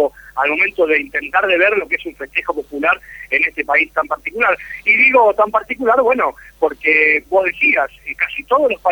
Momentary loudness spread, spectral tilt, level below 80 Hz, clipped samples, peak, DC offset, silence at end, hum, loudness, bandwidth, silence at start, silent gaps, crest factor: 9 LU; -4.5 dB/octave; -50 dBFS; under 0.1%; 0 dBFS; under 0.1%; 0 s; none; -15 LUFS; over 20 kHz; 0 s; none; 16 dB